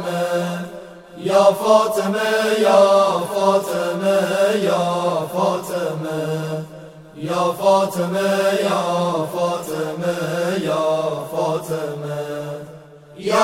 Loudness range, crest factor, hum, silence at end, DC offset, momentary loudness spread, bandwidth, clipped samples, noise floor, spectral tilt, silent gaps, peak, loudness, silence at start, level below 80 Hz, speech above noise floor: 6 LU; 18 dB; none; 0 s; under 0.1%; 14 LU; 16.5 kHz; under 0.1%; -41 dBFS; -5 dB/octave; none; -2 dBFS; -19 LUFS; 0 s; -62 dBFS; 23 dB